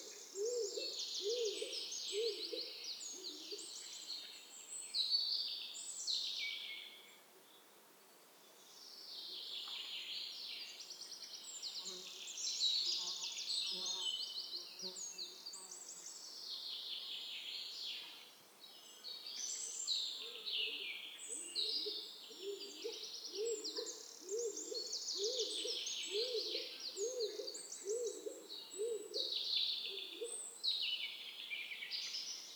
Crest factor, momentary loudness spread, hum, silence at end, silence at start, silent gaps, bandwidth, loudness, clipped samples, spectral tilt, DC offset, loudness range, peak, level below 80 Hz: 20 dB; 12 LU; none; 0 s; 0 s; none; over 20 kHz; -41 LUFS; under 0.1%; 1.5 dB/octave; under 0.1%; 7 LU; -24 dBFS; under -90 dBFS